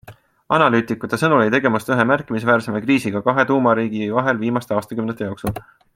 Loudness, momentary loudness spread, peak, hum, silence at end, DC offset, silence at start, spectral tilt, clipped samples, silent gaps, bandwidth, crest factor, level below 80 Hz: -18 LUFS; 10 LU; 0 dBFS; none; 0.35 s; under 0.1%; 0.1 s; -6.5 dB/octave; under 0.1%; none; 16.5 kHz; 18 dB; -54 dBFS